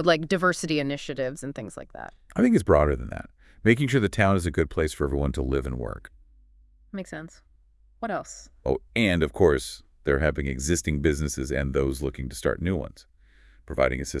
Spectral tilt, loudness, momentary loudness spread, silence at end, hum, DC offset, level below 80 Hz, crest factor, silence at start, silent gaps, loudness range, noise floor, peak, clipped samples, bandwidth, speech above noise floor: -5.5 dB/octave; -25 LUFS; 17 LU; 0 s; none; under 0.1%; -38 dBFS; 22 dB; 0 s; none; 8 LU; -58 dBFS; -4 dBFS; under 0.1%; 12 kHz; 33 dB